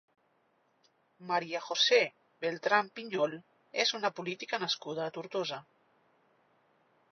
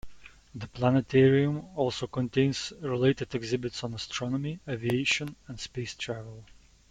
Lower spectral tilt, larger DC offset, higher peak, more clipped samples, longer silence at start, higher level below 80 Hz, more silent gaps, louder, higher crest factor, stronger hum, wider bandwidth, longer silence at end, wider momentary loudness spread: second, -0.5 dB/octave vs -5.5 dB/octave; neither; about the same, -12 dBFS vs -12 dBFS; neither; first, 1.2 s vs 0.05 s; second, -90 dBFS vs -58 dBFS; neither; second, -32 LUFS vs -29 LUFS; about the same, 22 dB vs 18 dB; neither; second, 6.6 kHz vs 11 kHz; first, 1.5 s vs 0.45 s; second, 13 LU vs 16 LU